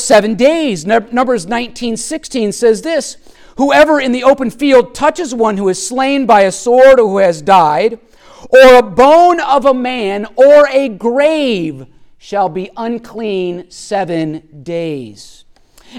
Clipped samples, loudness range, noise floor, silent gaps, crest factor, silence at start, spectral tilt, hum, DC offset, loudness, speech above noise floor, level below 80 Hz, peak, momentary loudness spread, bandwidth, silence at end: under 0.1%; 11 LU; -43 dBFS; none; 12 dB; 0 s; -4 dB/octave; none; under 0.1%; -11 LUFS; 32 dB; -42 dBFS; 0 dBFS; 15 LU; 14.5 kHz; 0 s